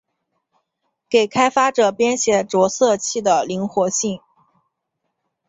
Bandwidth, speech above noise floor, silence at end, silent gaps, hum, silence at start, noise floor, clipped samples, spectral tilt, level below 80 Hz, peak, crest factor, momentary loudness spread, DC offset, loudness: 8.2 kHz; 59 dB; 1.3 s; none; none; 1.1 s; -76 dBFS; under 0.1%; -3.5 dB/octave; -62 dBFS; -2 dBFS; 18 dB; 6 LU; under 0.1%; -18 LUFS